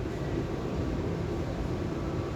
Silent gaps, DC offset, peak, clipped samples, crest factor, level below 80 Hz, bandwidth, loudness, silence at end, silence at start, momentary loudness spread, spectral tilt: none; under 0.1%; -18 dBFS; under 0.1%; 14 dB; -40 dBFS; 15 kHz; -33 LUFS; 0 s; 0 s; 1 LU; -7.5 dB/octave